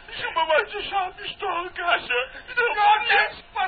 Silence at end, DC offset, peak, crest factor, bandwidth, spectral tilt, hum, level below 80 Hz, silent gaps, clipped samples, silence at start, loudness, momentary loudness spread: 0 s; under 0.1%; -6 dBFS; 18 dB; 4.8 kHz; 2 dB/octave; none; -54 dBFS; none; under 0.1%; 0 s; -23 LUFS; 10 LU